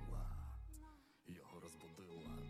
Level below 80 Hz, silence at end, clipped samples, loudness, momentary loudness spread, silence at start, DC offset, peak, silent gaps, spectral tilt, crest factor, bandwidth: -54 dBFS; 0 s; under 0.1%; -55 LUFS; 10 LU; 0 s; under 0.1%; -36 dBFS; none; -6 dB/octave; 14 dB; 15.5 kHz